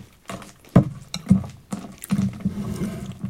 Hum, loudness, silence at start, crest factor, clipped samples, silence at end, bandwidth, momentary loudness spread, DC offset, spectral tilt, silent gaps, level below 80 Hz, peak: none; -24 LUFS; 0 s; 24 dB; under 0.1%; 0 s; 16 kHz; 17 LU; under 0.1%; -7 dB/octave; none; -44 dBFS; 0 dBFS